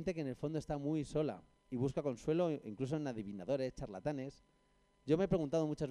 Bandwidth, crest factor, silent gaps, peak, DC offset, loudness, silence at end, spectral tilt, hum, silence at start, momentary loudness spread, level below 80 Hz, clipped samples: 11 kHz; 20 dB; none; -20 dBFS; under 0.1%; -39 LUFS; 0 s; -7.5 dB/octave; none; 0 s; 10 LU; -60 dBFS; under 0.1%